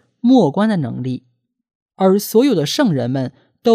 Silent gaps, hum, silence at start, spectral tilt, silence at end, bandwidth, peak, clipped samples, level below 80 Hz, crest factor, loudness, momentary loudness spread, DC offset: 1.75-1.86 s; none; 0.25 s; -6 dB/octave; 0 s; 15.5 kHz; -2 dBFS; under 0.1%; -64 dBFS; 16 dB; -16 LUFS; 12 LU; under 0.1%